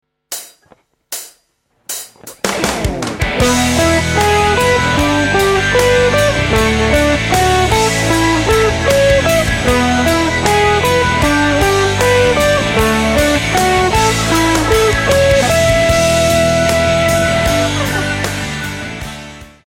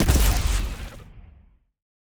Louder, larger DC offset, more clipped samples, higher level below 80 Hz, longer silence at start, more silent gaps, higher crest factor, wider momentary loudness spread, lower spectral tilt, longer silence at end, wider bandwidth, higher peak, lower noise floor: first, -12 LUFS vs -24 LUFS; neither; neither; about the same, -26 dBFS vs -26 dBFS; first, 0.3 s vs 0 s; neither; second, 12 dB vs 18 dB; second, 12 LU vs 20 LU; about the same, -4 dB/octave vs -4.5 dB/octave; second, 0.2 s vs 0.95 s; second, 17 kHz vs over 20 kHz; first, 0 dBFS vs -6 dBFS; first, -60 dBFS vs -55 dBFS